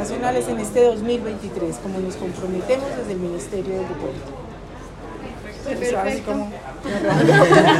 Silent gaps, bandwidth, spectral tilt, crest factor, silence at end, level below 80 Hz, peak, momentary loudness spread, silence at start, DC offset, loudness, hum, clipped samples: none; 13.5 kHz; -5.5 dB/octave; 20 dB; 0 s; -42 dBFS; 0 dBFS; 18 LU; 0 s; under 0.1%; -21 LUFS; none; under 0.1%